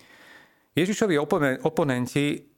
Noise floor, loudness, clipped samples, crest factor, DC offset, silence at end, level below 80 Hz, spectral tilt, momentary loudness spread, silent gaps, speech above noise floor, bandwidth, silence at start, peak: -54 dBFS; -25 LUFS; under 0.1%; 18 dB; under 0.1%; 0.15 s; -60 dBFS; -5.5 dB/octave; 4 LU; none; 30 dB; 17 kHz; 0.75 s; -8 dBFS